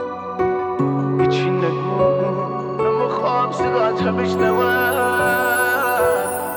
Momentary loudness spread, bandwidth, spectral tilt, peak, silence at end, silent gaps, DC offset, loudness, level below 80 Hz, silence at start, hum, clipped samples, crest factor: 4 LU; over 20 kHz; -5.5 dB/octave; -6 dBFS; 0 s; none; under 0.1%; -18 LUFS; -50 dBFS; 0 s; none; under 0.1%; 14 dB